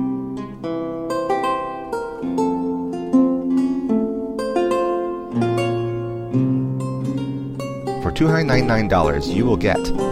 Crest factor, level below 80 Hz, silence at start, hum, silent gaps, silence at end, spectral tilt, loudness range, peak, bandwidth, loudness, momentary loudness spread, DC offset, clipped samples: 16 dB; -36 dBFS; 0 s; none; none; 0 s; -7 dB/octave; 3 LU; -4 dBFS; 13 kHz; -21 LUFS; 9 LU; under 0.1%; under 0.1%